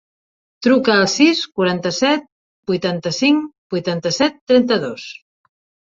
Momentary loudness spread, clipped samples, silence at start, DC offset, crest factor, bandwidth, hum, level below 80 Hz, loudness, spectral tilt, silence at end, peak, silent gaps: 11 LU; under 0.1%; 0.6 s; under 0.1%; 16 dB; 7.8 kHz; none; -58 dBFS; -17 LUFS; -4.5 dB/octave; 0.7 s; -2 dBFS; 2.32-2.63 s, 3.58-3.70 s, 4.41-4.47 s